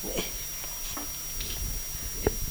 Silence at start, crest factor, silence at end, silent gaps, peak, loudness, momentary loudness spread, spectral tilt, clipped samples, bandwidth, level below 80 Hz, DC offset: 0 s; 24 dB; 0 s; none; -8 dBFS; -32 LUFS; 3 LU; -2.5 dB/octave; under 0.1%; over 20 kHz; -38 dBFS; under 0.1%